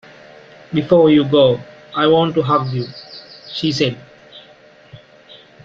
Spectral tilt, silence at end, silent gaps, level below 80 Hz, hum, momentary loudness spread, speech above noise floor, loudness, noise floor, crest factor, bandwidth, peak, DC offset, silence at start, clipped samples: -7 dB/octave; 0.7 s; none; -54 dBFS; none; 20 LU; 31 dB; -16 LUFS; -46 dBFS; 16 dB; 7.4 kHz; -2 dBFS; under 0.1%; 0.7 s; under 0.1%